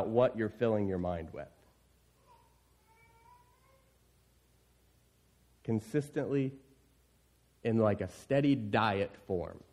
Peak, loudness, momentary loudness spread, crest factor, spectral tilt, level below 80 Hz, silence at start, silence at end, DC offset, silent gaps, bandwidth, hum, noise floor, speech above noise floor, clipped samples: -14 dBFS; -33 LUFS; 10 LU; 20 dB; -7.5 dB/octave; -64 dBFS; 0 s; 0.15 s; under 0.1%; none; 13.5 kHz; none; -69 dBFS; 36 dB; under 0.1%